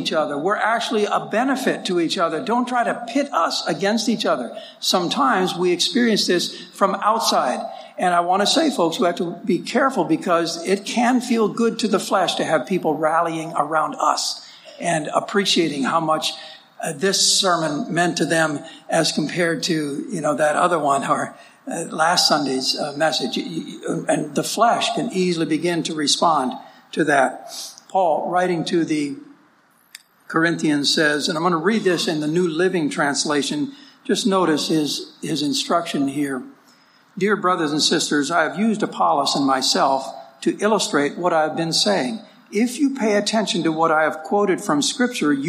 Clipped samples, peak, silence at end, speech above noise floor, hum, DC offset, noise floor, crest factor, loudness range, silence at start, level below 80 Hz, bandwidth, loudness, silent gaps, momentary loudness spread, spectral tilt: under 0.1%; -2 dBFS; 0 s; 37 dB; none; under 0.1%; -57 dBFS; 18 dB; 2 LU; 0 s; -74 dBFS; 15.5 kHz; -20 LUFS; none; 8 LU; -3.5 dB/octave